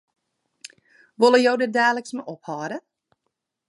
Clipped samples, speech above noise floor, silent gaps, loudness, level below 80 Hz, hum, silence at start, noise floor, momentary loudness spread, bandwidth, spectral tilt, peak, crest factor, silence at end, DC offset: under 0.1%; 58 dB; none; -20 LUFS; -82 dBFS; none; 1.2 s; -79 dBFS; 17 LU; 11.5 kHz; -4 dB/octave; -4 dBFS; 20 dB; 0.9 s; under 0.1%